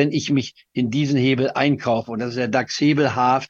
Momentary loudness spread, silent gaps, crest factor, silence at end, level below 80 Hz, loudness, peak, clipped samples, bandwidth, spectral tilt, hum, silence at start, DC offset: 6 LU; none; 18 dB; 0.05 s; -60 dBFS; -20 LUFS; -2 dBFS; under 0.1%; 7.6 kHz; -6 dB/octave; none; 0 s; under 0.1%